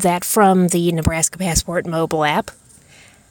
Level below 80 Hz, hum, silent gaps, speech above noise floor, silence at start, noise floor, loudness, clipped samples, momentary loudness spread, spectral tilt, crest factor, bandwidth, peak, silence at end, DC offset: -36 dBFS; none; none; 30 dB; 0 s; -47 dBFS; -17 LUFS; under 0.1%; 8 LU; -4.5 dB/octave; 16 dB; 17.5 kHz; -2 dBFS; 0.8 s; under 0.1%